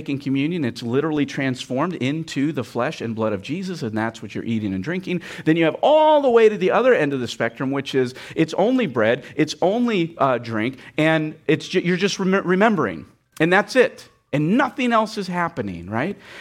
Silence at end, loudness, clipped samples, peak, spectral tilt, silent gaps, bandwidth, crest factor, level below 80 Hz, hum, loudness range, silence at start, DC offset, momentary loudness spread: 0 s; -21 LUFS; under 0.1%; -4 dBFS; -6 dB/octave; none; 14.5 kHz; 16 dB; -62 dBFS; none; 6 LU; 0 s; under 0.1%; 10 LU